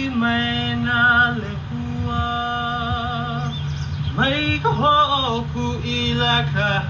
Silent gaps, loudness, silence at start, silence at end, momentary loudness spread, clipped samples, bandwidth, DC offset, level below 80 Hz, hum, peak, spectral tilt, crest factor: none; -20 LUFS; 0 s; 0 s; 10 LU; under 0.1%; 7.6 kHz; under 0.1%; -34 dBFS; none; -6 dBFS; -6 dB/octave; 16 dB